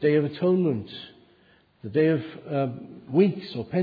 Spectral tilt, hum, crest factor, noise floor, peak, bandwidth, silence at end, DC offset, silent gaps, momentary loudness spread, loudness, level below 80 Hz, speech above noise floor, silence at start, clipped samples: -10.5 dB/octave; none; 18 dB; -60 dBFS; -8 dBFS; 5 kHz; 0 s; under 0.1%; none; 18 LU; -25 LUFS; -68 dBFS; 36 dB; 0 s; under 0.1%